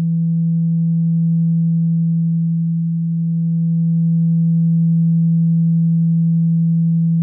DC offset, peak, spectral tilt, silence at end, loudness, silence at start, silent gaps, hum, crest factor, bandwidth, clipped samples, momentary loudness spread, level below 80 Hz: under 0.1%; -10 dBFS; -17.5 dB/octave; 0 s; -16 LUFS; 0 s; none; none; 4 dB; 0.5 kHz; under 0.1%; 3 LU; -84 dBFS